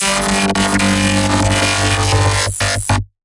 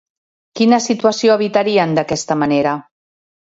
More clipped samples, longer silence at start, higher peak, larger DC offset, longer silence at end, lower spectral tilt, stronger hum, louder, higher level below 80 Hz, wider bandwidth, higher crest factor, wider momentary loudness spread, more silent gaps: neither; second, 0 s vs 0.55 s; about the same, -2 dBFS vs 0 dBFS; neither; second, 0.2 s vs 0.6 s; second, -3.5 dB/octave vs -5 dB/octave; neither; about the same, -14 LUFS vs -15 LUFS; first, -30 dBFS vs -58 dBFS; first, 11.5 kHz vs 8 kHz; about the same, 12 dB vs 16 dB; second, 3 LU vs 6 LU; neither